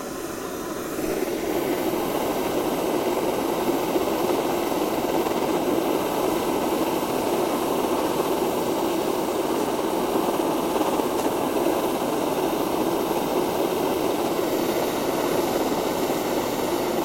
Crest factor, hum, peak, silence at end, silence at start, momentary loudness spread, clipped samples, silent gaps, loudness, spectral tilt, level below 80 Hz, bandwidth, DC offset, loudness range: 16 dB; none; -6 dBFS; 0 s; 0 s; 2 LU; under 0.1%; none; -24 LUFS; -4.5 dB/octave; -52 dBFS; 16.5 kHz; under 0.1%; 1 LU